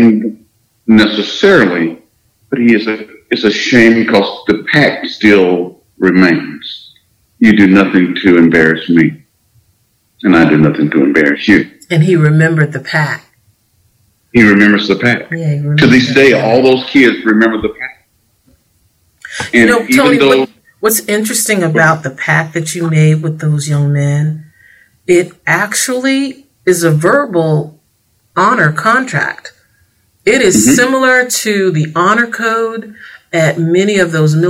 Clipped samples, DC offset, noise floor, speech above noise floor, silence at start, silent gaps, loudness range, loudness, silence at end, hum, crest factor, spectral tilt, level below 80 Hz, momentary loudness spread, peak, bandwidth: 0.5%; under 0.1%; -57 dBFS; 47 dB; 0 s; none; 3 LU; -10 LUFS; 0 s; none; 10 dB; -5 dB/octave; -46 dBFS; 11 LU; 0 dBFS; 16.5 kHz